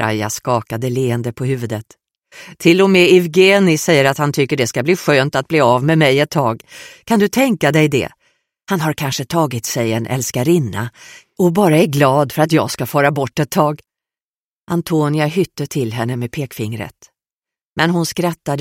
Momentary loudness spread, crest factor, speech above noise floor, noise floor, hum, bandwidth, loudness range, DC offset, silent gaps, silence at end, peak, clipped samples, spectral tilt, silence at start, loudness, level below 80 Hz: 12 LU; 16 dB; over 75 dB; under -90 dBFS; none; 16.5 kHz; 8 LU; under 0.1%; 14.24-14.67 s, 17.33-17.42 s, 17.65-17.76 s; 0 s; 0 dBFS; under 0.1%; -5.5 dB/octave; 0 s; -15 LUFS; -54 dBFS